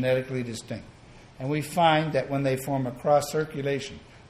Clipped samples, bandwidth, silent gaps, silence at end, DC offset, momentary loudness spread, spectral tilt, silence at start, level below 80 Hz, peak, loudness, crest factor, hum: under 0.1%; 14.5 kHz; none; 0 s; under 0.1%; 15 LU; -5.5 dB/octave; 0 s; -56 dBFS; -8 dBFS; -26 LUFS; 20 dB; none